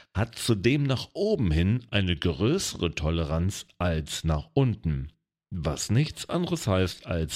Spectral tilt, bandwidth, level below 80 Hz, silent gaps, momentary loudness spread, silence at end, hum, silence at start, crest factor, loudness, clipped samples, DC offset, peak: -5.5 dB/octave; 16 kHz; -40 dBFS; none; 7 LU; 0 s; none; 0.15 s; 18 dB; -27 LUFS; under 0.1%; under 0.1%; -8 dBFS